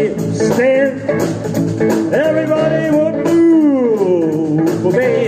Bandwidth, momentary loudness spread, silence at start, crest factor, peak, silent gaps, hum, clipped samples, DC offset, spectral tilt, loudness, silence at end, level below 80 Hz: 15.5 kHz; 7 LU; 0 s; 10 dB; -2 dBFS; none; none; under 0.1%; under 0.1%; -7 dB/octave; -14 LUFS; 0 s; -52 dBFS